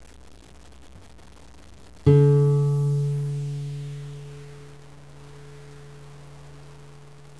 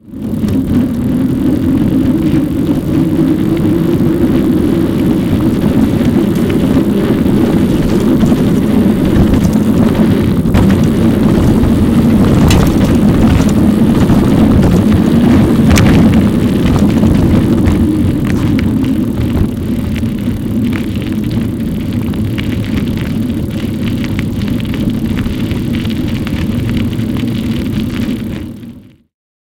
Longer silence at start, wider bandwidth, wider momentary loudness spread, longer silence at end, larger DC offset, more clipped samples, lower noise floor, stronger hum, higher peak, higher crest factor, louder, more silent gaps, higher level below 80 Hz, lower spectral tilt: first, 2.05 s vs 0.05 s; second, 11 kHz vs 17 kHz; first, 28 LU vs 8 LU; second, 0.55 s vs 0.75 s; first, 0.4% vs under 0.1%; neither; first, -48 dBFS vs -33 dBFS; neither; second, -4 dBFS vs 0 dBFS; first, 22 dB vs 10 dB; second, -22 LUFS vs -11 LUFS; neither; second, -52 dBFS vs -22 dBFS; first, -9 dB/octave vs -7.5 dB/octave